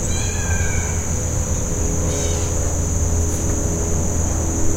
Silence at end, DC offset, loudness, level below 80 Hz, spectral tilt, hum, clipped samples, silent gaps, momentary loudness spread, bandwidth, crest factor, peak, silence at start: 0 s; under 0.1%; -21 LUFS; -24 dBFS; -4.5 dB/octave; none; under 0.1%; none; 1 LU; 16 kHz; 14 dB; -6 dBFS; 0 s